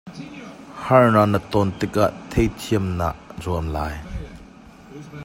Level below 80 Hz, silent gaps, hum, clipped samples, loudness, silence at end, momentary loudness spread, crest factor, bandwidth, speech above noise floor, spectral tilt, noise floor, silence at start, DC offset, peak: -38 dBFS; none; none; under 0.1%; -21 LUFS; 0 s; 23 LU; 20 dB; 16.5 kHz; 25 dB; -7 dB/octave; -44 dBFS; 0.05 s; under 0.1%; -2 dBFS